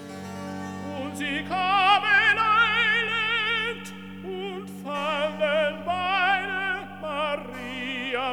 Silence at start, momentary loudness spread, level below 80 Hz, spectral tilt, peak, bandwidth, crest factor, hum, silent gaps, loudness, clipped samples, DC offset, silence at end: 0 s; 16 LU; -72 dBFS; -4 dB/octave; -8 dBFS; over 20 kHz; 18 dB; none; none; -24 LUFS; under 0.1%; 0.3%; 0 s